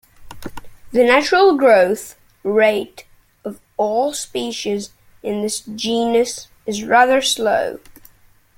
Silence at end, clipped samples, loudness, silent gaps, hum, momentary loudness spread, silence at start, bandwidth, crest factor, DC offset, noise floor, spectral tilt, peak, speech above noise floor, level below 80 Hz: 0.8 s; under 0.1%; -17 LUFS; none; none; 21 LU; 0.2 s; 17 kHz; 18 dB; under 0.1%; -51 dBFS; -3 dB/octave; 0 dBFS; 35 dB; -52 dBFS